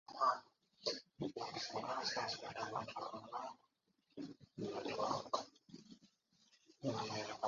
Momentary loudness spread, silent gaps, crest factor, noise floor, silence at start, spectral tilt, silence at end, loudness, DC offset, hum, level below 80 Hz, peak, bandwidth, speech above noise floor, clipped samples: 16 LU; none; 22 dB; -81 dBFS; 0.1 s; -2.5 dB/octave; 0 s; -44 LUFS; under 0.1%; none; -80 dBFS; -24 dBFS; 7.4 kHz; 37 dB; under 0.1%